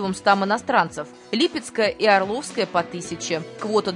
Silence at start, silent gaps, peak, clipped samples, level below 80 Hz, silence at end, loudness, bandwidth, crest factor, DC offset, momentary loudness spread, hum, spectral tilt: 0 s; none; -4 dBFS; under 0.1%; -62 dBFS; 0 s; -22 LUFS; 11 kHz; 20 dB; under 0.1%; 9 LU; none; -4 dB/octave